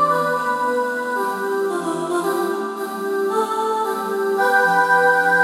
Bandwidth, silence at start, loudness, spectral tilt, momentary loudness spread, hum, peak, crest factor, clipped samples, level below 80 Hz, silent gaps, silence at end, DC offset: 16.5 kHz; 0 s; -19 LUFS; -4 dB/octave; 9 LU; none; -4 dBFS; 14 dB; under 0.1%; -74 dBFS; none; 0 s; under 0.1%